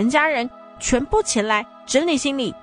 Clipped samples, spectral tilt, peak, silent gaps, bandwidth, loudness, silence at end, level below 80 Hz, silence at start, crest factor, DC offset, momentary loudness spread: under 0.1%; -3 dB/octave; -4 dBFS; none; 10 kHz; -20 LUFS; 0.05 s; -40 dBFS; 0 s; 16 dB; under 0.1%; 6 LU